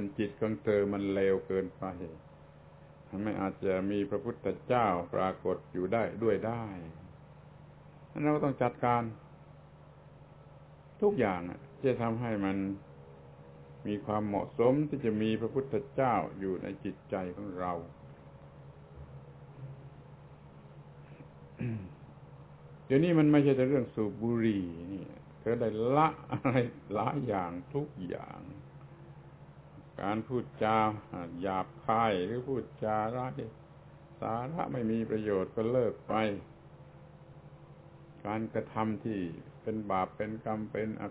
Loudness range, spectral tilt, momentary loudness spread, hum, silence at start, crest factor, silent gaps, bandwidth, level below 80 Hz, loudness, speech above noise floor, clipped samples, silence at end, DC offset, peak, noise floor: 10 LU; -6.5 dB/octave; 24 LU; none; 0 s; 22 dB; none; 4 kHz; -60 dBFS; -33 LUFS; 23 dB; under 0.1%; 0 s; under 0.1%; -12 dBFS; -55 dBFS